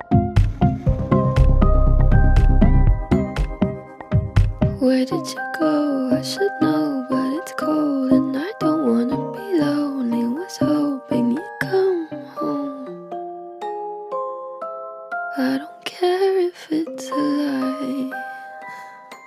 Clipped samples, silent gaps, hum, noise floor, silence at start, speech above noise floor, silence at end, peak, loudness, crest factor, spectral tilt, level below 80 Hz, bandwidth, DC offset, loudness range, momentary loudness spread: under 0.1%; none; none; -39 dBFS; 0 s; 19 dB; 0 s; -4 dBFS; -21 LUFS; 16 dB; -7.5 dB/octave; -24 dBFS; 13 kHz; under 0.1%; 7 LU; 14 LU